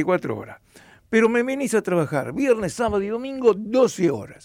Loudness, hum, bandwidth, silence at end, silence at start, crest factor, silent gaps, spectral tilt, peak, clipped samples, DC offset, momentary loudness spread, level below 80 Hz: -22 LUFS; none; 15.5 kHz; 0.1 s; 0 s; 16 dB; none; -6 dB/octave; -6 dBFS; under 0.1%; under 0.1%; 7 LU; -54 dBFS